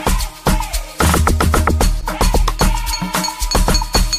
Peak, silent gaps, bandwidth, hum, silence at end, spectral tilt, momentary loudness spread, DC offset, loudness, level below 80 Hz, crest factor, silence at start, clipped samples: 0 dBFS; none; 15.5 kHz; none; 0 s; -4 dB/octave; 5 LU; under 0.1%; -17 LUFS; -18 dBFS; 14 dB; 0 s; under 0.1%